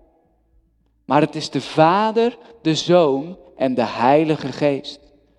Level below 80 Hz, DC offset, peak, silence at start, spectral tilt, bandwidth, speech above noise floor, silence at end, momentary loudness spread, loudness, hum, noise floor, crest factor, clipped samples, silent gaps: -60 dBFS; under 0.1%; 0 dBFS; 1.1 s; -6 dB/octave; 11 kHz; 43 dB; 0.4 s; 10 LU; -19 LUFS; none; -61 dBFS; 18 dB; under 0.1%; none